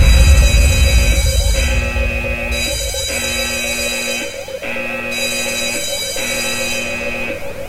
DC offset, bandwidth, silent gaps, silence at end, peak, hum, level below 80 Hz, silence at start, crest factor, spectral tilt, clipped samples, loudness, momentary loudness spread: under 0.1%; 16 kHz; none; 0 s; 0 dBFS; none; -18 dBFS; 0 s; 14 dB; -3.5 dB/octave; under 0.1%; -16 LUFS; 9 LU